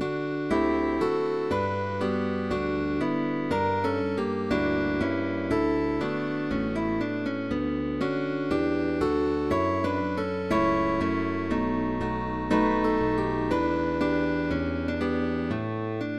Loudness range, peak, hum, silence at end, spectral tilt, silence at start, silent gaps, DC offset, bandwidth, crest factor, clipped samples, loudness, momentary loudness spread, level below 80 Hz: 2 LU; -12 dBFS; none; 0 s; -7.5 dB/octave; 0 s; none; 0.3%; 11 kHz; 14 dB; under 0.1%; -27 LUFS; 4 LU; -44 dBFS